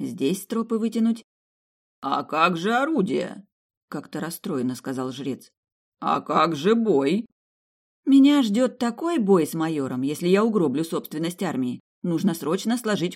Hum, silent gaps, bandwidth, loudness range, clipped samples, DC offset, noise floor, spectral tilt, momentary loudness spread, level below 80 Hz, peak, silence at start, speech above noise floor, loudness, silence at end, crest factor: none; 1.24-2.02 s, 3.52-3.70 s, 3.77-3.88 s, 5.57-5.63 s, 5.72-5.92 s, 7.32-8.03 s, 11.80-12.02 s; 16 kHz; 6 LU; under 0.1%; under 0.1%; under -90 dBFS; -6 dB/octave; 12 LU; -74 dBFS; -4 dBFS; 0 s; over 67 dB; -23 LUFS; 0 s; 20 dB